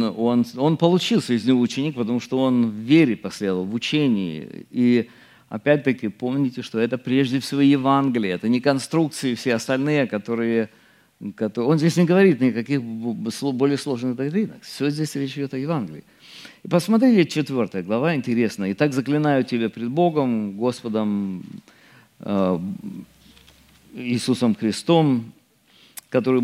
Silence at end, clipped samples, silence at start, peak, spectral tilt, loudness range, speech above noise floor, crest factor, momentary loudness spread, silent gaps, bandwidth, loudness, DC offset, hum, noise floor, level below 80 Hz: 0 s; under 0.1%; 0 s; -2 dBFS; -6.5 dB/octave; 5 LU; 35 dB; 18 dB; 13 LU; none; 15 kHz; -21 LUFS; under 0.1%; none; -56 dBFS; -68 dBFS